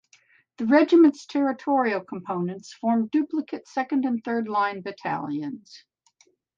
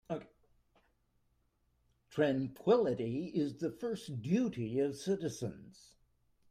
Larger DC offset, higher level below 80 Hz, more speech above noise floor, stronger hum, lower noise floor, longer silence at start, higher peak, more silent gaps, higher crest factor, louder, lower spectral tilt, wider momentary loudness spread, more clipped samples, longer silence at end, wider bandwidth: neither; about the same, -76 dBFS vs -72 dBFS; about the same, 40 dB vs 41 dB; neither; second, -64 dBFS vs -76 dBFS; first, 0.6 s vs 0.1 s; first, -8 dBFS vs -18 dBFS; neither; about the same, 18 dB vs 20 dB; first, -24 LUFS vs -35 LUFS; about the same, -6.5 dB/octave vs -7 dB/octave; about the same, 14 LU vs 13 LU; neither; about the same, 0.8 s vs 0.8 s; second, 7.6 kHz vs 15.5 kHz